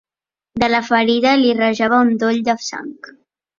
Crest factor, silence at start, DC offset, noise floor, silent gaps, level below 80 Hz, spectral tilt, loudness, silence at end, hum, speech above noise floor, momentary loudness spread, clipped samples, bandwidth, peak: 16 dB; 0.55 s; under 0.1%; under -90 dBFS; none; -52 dBFS; -4 dB/octave; -16 LUFS; 0.5 s; none; over 74 dB; 14 LU; under 0.1%; 7.4 kHz; -2 dBFS